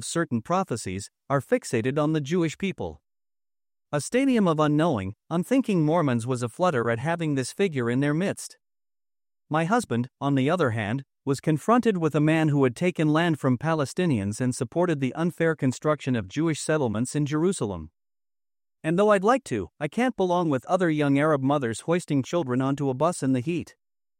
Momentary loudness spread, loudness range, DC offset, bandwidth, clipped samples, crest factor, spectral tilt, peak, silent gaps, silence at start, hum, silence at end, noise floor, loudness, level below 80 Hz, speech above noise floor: 9 LU; 4 LU; under 0.1%; 16 kHz; under 0.1%; 16 dB; -6.5 dB/octave; -8 dBFS; none; 0 s; none; 0.55 s; under -90 dBFS; -25 LUFS; -64 dBFS; over 66 dB